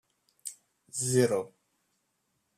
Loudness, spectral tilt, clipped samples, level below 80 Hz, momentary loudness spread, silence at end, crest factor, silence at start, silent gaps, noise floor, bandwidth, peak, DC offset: -29 LUFS; -4.5 dB/octave; under 0.1%; -74 dBFS; 17 LU; 1.1 s; 22 dB; 0.45 s; none; -78 dBFS; 14.5 kHz; -12 dBFS; under 0.1%